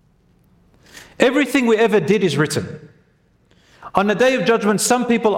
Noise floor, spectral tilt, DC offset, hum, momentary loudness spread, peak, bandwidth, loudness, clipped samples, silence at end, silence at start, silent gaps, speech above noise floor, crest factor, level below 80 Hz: -58 dBFS; -4.5 dB/octave; under 0.1%; none; 8 LU; 0 dBFS; 16.5 kHz; -17 LUFS; under 0.1%; 0 s; 0.95 s; none; 42 dB; 18 dB; -58 dBFS